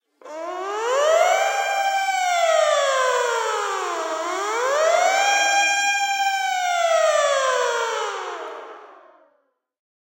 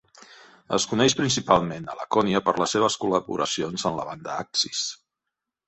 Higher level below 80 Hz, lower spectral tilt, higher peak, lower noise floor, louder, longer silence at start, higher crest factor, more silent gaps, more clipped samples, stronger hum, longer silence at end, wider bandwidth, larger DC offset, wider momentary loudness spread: second, under -90 dBFS vs -58 dBFS; second, 3 dB/octave vs -3.5 dB/octave; second, -6 dBFS vs -2 dBFS; second, -68 dBFS vs -85 dBFS; first, -20 LUFS vs -24 LUFS; about the same, 0.25 s vs 0.15 s; second, 16 dB vs 24 dB; neither; neither; neither; first, 1.15 s vs 0.75 s; first, 16 kHz vs 8.4 kHz; neither; about the same, 12 LU vs 11 LU